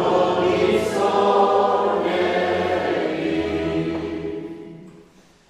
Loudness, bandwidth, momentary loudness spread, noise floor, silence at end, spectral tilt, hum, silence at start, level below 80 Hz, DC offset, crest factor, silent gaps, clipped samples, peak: -20 LUFS; 13.5 kHz; 13 LU; -51 dBFS; 0.6 s; -6 dB/octave; none; 0 s; -50 dBFS; under 0.1%; 16 dB; none; under 0.1%; -4 dBFS